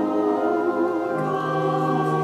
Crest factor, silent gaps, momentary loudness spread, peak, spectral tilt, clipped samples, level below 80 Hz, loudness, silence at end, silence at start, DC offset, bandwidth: 12 dB; none; 2 LU; -10 dBFS; -8 dB/octave; under 0.1%; -68 dBFS; -23 LUFS; 0 s; 0 s; under 0.1%; 13.5 kHz